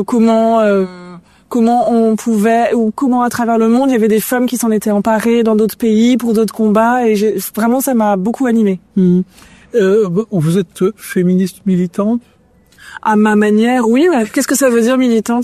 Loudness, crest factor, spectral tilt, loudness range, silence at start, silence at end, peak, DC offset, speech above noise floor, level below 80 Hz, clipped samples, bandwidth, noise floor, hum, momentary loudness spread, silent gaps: -13 LUFS; 12 dB; -6 dB/octave; 2 LU; 0 s; 0 s; 0 dBFS; under 0.1%; 35 dB; -54 dBFS; under 0.1%; 14 kHz; -47 dBFS; none; 5 LU; none